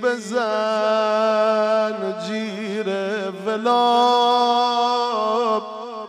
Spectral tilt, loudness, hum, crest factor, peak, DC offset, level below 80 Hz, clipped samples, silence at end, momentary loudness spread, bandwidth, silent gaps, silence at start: -4 dB/octave; -20 LUFS; none; 14 dB; -6 dBFS; under 0.1%; -82 dBFS; under 0.1%; 0 s; 10 LU; 12 kHz; none; 0 s